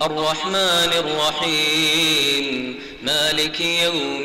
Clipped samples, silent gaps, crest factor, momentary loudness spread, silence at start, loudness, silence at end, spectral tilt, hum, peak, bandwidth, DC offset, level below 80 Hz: under 0.1%; none; 12 dB; 7 LU; 0 s; -18 LUFS; 0 s; -2 dB/octave; none; -8 dBFS; 16 kHz; under 0.1%; -52 dBFS